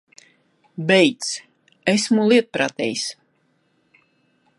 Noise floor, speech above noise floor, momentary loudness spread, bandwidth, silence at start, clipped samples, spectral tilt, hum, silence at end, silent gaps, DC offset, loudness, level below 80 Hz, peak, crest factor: -65 dBFS; 46 dB; 13 LU; 11.5 kHz; 0.8 s; under 0.1%; -4 dB/octave; none; 1.45 s; none; under 0.1%; -20 LUFS; -70 dBFS; -2 dBFS; 20 dB